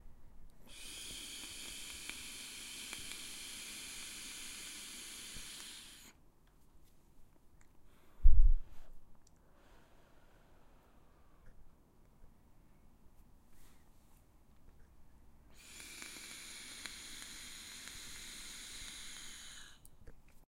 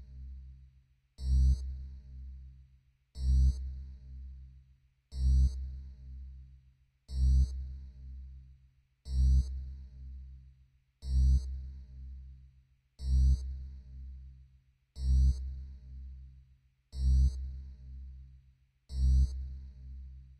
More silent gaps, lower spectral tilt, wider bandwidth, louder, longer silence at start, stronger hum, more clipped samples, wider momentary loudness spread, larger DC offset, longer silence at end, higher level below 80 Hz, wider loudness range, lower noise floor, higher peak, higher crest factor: neither; second, -2 dB/octave vs -7.5 dB/octave; first, 15.5 kHz vs 8.2 kHz; second, -44 LUFS vs -33 LUFS; first, 0.4 s vs 0 s; neither; neither; about the same, 21 LU vs 22 LU; neither; first, 11.55 s vs 0.15 s; second, -40 dBFS vs -34 dBFS; first, 12 LU vs 3 LU; about the same, -64 dBFS vs -66 dBFS; first, -12 dBFS vs -20 dBFS; first, 24 dB vs 14 dB